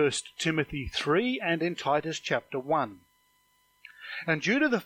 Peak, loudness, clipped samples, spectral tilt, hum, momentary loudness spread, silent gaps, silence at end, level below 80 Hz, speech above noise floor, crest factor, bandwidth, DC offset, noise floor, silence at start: -12 dBFS; -29 LUFS; under 0.1%; -4.5 dB/octave; 50 Hz at -60 dBFS; 7 LU; none; 0 s; -56 dBFS; 40 dB; 18 dB; 16 kHz; under 0.1%; -68 dBFS; 0 s